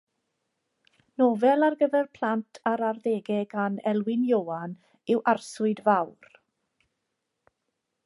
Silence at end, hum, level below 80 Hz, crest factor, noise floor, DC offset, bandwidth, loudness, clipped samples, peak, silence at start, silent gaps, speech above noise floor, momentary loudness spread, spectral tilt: 1.95 s; none; -80 dBFS; 18 dB; -81 dBFS; under 0.1%; 11.5 kHz; -26 LUFS; under 0.1%; -8 dBFS; 1.2 s; none; 56 dB; 11 LU; -6.5 dB/octave